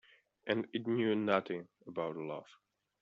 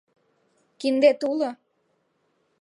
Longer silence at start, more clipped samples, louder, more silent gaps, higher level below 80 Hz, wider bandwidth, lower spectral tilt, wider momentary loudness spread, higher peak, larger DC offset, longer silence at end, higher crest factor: second, 0.45 s vs 0.8 s; neither; second, -36 LUFS vs -23 LUFS; neither; about the same, -82 dBFS vs -82 dBFS; second, 7.2 kHz vs 11 kHz; about the same, -4.5 dB/octave vs -4 dB/octave; about the same, 12 LU vs 10 LU; second, -14 dBFS vs -6 dBFS; neither; second, 0.6 s vs 1.05 s; about the same, 24 dB vs 20 dB